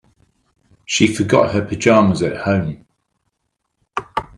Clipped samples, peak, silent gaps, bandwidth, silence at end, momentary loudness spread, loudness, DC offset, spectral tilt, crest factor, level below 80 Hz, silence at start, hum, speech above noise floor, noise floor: under 0.1%; 0 dBFS; none; 11.5 kHz; 0.15 s; 15 LU; -16 LUFS; under 0.1%; -5 dB/octave; 18 dB; -50 dBFS; 0.9 s; none; 58 dB; -73 dBFS